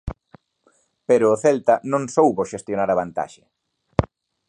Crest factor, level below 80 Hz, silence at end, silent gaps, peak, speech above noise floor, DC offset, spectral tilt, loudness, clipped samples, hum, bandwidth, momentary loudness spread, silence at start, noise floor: 22 dB; -44 dBFS; 0.45 s; none; 0 dBFS; 44 dB; under 0.1%; -6.5 dB/octave; -20 LUFS; under 0.1%; none; 10.5 kHz; 15 LU; 0.05 s; -63 dBFS